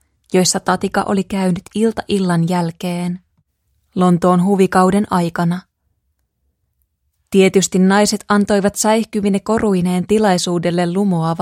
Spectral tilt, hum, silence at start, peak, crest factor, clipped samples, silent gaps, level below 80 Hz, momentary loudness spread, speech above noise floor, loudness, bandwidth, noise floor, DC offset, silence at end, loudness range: -5.5 dB/octave; none; 0.3 s; 0 dBFS; 16 dB; under 0.1%; none; -48 dBFS; 7 LU; 53 dB; -16 LUFS; 16 kHz; -68 dBFS; under 0.1%; 0 s; 3 LU